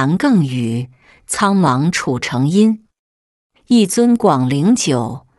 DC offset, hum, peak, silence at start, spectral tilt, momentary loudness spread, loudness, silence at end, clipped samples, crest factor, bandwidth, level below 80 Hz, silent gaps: under 0.1%; none; -2 dBFS; 0 s; -5.5 dB/octave; 9 LU; -15 LUFS; 0.2 s; under 0.1%; 14 dB; 12 kHz; -54 dBFS; 2.99-3.50 s